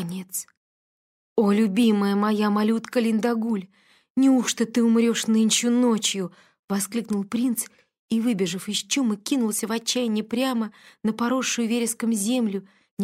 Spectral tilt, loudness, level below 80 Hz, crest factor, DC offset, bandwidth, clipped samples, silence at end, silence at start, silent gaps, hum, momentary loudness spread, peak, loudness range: -4 dB/octave; -23 LUFS; -72 dBFS; 16 dB; under 0.1%; 16 kHz; under 0.1%; 0 s; 0 s; 0.57-1.36 s, 4.10-4.15 s, 6.59-6.68 s, 7.99-8.08 s, 12.91-12.97 s; none; 10 LU; -8 dBFS; 4 LU